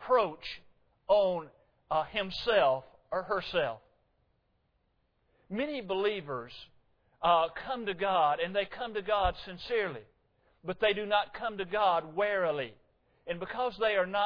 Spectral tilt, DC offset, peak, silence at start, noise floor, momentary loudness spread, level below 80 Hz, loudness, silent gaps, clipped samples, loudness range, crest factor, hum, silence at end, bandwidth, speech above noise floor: -6 dB/octave; under 0.1%; -14 dBFS; 0 s; -75 dBFS; 14 LU; -56 dBFS; -31 LUFS; none; under 0.1%; 6 LU; 18 dB; none; 0 s; 5.4 kHz; 44 dB